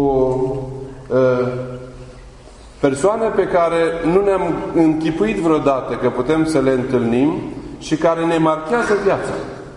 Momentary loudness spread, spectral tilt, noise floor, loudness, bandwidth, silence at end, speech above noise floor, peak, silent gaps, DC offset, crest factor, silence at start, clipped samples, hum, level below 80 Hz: 12 LU; -6.5 dB/octave; -40 dBFS; -17 LUFS; 11 kHz; 0 s; 23 dB; -2 dBFS; none; under 0.1%; 16 dB; 0 s; under 0.1%; none; -42 dBFS